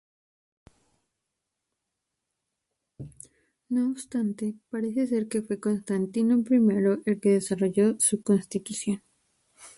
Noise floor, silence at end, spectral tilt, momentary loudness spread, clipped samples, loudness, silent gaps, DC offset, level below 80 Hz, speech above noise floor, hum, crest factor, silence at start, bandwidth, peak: -84 dBFS; 0.1 s; -5.5 dB/octave; 11 LU; under 0.1%; -26 LUFS; none; under 0.1%; -68 dBFS; 58 dB; none; 18 dB; 3 s; 11.5 kHz; -10 dBFS